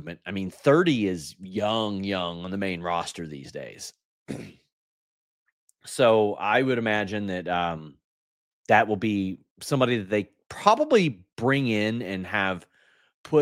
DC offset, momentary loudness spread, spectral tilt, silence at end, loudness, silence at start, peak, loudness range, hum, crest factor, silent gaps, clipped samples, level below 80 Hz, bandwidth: under 0.1%; 17 LU; -5.5 dB/octave; 0 s; -25 LUFS; 0 s; -2 dBFS; 8 LU; none; 24 dB; 4.04-4.26 s, 4.72-5.46 s, 5.52-5.68 s, 8.04-8.64 s, 9.51-9.56 s, 10.46-10.50 s, 11.32-11.36 s, 13.14-13.24 s; under 0.1%; -64 dBFS; 16 kHz